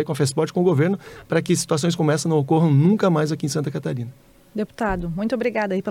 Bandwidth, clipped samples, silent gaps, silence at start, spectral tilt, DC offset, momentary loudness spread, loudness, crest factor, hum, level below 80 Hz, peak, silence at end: 15.5 kHz; under 0.1%; none; 0 s; -6 dB/octave; under 0.1%; 12 LU; -21 LUFS; 12 dB; none; -46 dBFS; -8 dBFS; 0 s